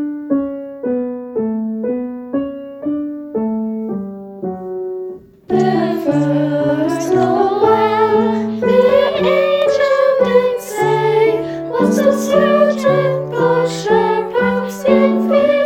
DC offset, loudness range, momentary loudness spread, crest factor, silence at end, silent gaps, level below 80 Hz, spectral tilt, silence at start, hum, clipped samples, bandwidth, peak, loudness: under 0.1%; 8 LU; 11 LU; 16 dB; 0 s; none; -52 dBFS; -6 dB/octave; 0 s; none; under 0.1%; 17 kHz; 0 dBFS; -15 LUFS